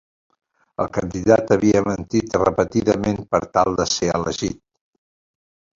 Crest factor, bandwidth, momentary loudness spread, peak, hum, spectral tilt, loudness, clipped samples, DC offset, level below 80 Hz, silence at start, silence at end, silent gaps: 20 dB; 7.8 kHz; 10 LU; -2 dBFS; none; -5 dB/octave; -20 LUFS; under 0.1%; under 0.1%; -44 dBFS; 0.8 s; 1.25 s; none